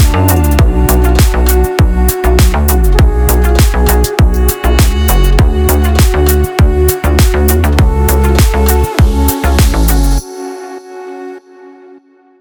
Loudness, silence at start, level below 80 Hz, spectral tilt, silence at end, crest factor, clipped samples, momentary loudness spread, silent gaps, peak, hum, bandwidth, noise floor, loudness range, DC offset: -10 LUFS; 0 s; -10 dBFS; -5.5 dB/octave; 0.7 s; 8 dB; under 0.1%; 8 LU; none; 0 dBFS; none; over 20 kHz; -41 dBFS; 3 LU; under 0.1%